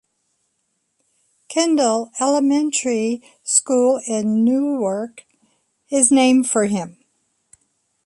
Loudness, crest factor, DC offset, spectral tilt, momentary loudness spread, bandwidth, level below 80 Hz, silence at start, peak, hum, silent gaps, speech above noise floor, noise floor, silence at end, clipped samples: -18 LUFS; 20 dB; under 0.1%; -3.5 dB/octave; 11 LU; 11.5 kHz; -68 dBFS; 1.5 s; 0 dBFS; none; none; 53 dB; -71 dBFS; 1.15 s; under 0.1%